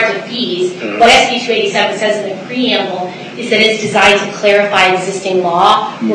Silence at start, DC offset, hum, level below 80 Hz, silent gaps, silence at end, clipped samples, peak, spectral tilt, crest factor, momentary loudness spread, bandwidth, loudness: 0 s; under 0.1%; none; -48 dBFS; none; 0 s; under 0.1%; 0 dBFS; -3 dB/octave; 12 dB; 9 LU; 12.5 kHz; -11 LUFS